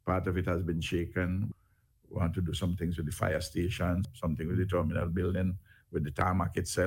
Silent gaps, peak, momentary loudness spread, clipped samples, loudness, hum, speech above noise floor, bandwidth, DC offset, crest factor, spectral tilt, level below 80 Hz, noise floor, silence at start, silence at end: none; -14 dBFS; 6 LU; under 0.1%; -33 LUFS; none; 35 dB; 16.5 kHz; under 0.1%; 18 dB; -6.5 dB/octave; -48 dBFS; -67 dBFS; 0.05 s; 0 s